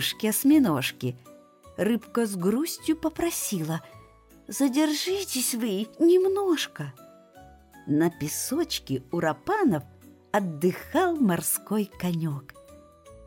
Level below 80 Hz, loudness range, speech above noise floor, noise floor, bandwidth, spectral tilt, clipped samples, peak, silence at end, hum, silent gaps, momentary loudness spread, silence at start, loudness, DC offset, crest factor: -60 dBFS; 3 LU; 28 dB; -53 dBFS; 17 kHz; -4.5 dB/octave; under 0.1%; -12 dBFS; 0 s; none; none; 12 LU; 0 s; -26 LUFS; under 0.1%; 14 dB